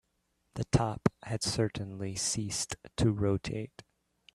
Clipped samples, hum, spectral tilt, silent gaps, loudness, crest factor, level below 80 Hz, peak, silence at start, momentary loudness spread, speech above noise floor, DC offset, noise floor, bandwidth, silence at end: under 0.1%; none; -5 dB/octave; none; -32 LUFS; 24 dB; -52 dBFS; -10 dBFS; 0.55 s; 11 LU; 46 dB; under 0.1%; -77 dBFS; 13.5 kHz; 0.7 s